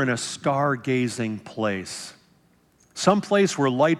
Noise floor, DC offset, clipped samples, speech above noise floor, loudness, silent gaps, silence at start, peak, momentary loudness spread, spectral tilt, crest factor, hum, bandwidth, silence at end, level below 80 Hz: -60 dBFS; under 0.1%; under 0.1%; 38 dB; -24 LUFS; none; 0 s; -6 dBFS; 14 LU; -5 dB/octave; 18 dB; none; 13.5 kHz; 0 s; -70 dBFS